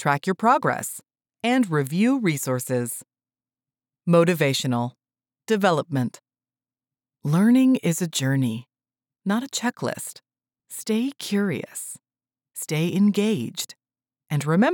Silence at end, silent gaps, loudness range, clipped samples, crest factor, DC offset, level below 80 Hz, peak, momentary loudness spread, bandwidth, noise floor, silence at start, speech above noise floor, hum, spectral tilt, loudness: 0 s; none; 5 LU; under 0.1%; 18 dB; under 0.1%; -84 dBFS; -6 dBFS; 15 LU; over 20 kHz; under -90 dBFS; 0 s; over 68 dB; none; -5.5 dB/octave; -23 LUFS